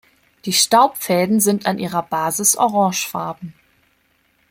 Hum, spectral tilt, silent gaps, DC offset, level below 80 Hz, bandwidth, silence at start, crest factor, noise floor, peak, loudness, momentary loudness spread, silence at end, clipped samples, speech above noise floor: none; -3 dB/octave; none; under 0.1%; -62 dBFS; 16.5 kHz; 0.45 s; 18 dB; -62 dBFS; -2 dBFS; -17 LUFS; 14 LU; 1 s; under 0.1%; 44 dB